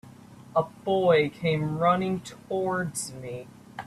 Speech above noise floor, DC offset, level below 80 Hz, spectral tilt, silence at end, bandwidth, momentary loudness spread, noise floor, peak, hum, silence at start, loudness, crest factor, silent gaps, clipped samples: 22 dB; under 0.1%; -62 dBFS; -5.5 dB/octave; 0 s; 14 kHz; 16 LU; -48 dBFS; -10 dBFS; none; 0.05 s; -26 LUFS; 18 dB; none; under 0.1%